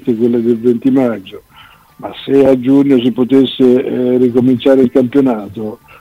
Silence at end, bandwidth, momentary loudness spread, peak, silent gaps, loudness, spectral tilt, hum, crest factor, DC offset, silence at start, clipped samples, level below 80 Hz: 0.25 s; 5.4 kHz; 15 LU; 0 dBFS; none; -11 LUFS; -8 dB/octave; none; 12 dB; under 0.1%; 0.05 s; under 0.1%; -50 dBFS